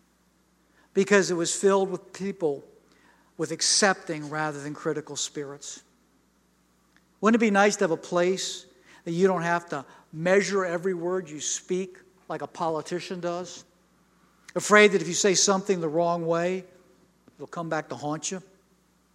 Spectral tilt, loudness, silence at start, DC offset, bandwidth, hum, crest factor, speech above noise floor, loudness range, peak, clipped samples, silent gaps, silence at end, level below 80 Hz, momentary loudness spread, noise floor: -3.5 dB/octave; -25 LUFS; 0.95 s; under 0.1%; 13 kHz; none; 24 dB; 40 dB; 8 LU; -4 dBFS; under 0.1%; none; 0.75 s; -74 dBFS; 16 LU; -65 dBFS